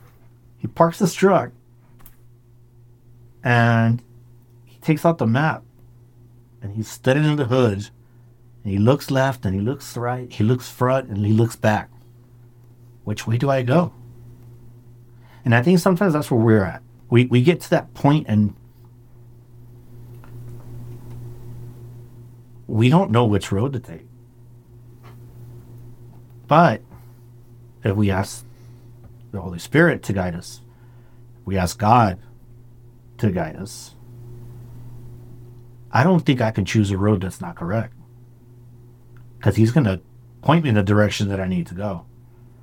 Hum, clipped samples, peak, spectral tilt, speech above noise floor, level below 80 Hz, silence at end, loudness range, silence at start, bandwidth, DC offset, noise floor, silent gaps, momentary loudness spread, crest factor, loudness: none; under 0.1%; -2 dBFS; -7 dB/octave; 31 dB; -50 dBFS; 0.6 s; 6 LU; 0.65 s; 17 kHz; under 0.1%; -49 dBFS; none; 23 LU; 20 dB; -20 LUFS